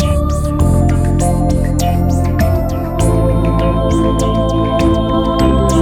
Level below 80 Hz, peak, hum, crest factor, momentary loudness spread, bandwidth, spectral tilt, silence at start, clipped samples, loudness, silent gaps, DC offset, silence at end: -18 dBFS; -2 dBFS; none; 10 dB; 2 LU; 15.5 kHz; -7 dB/octave; 0 s; under 0.1%; -14 LUFS; none; 0.8%; 0 s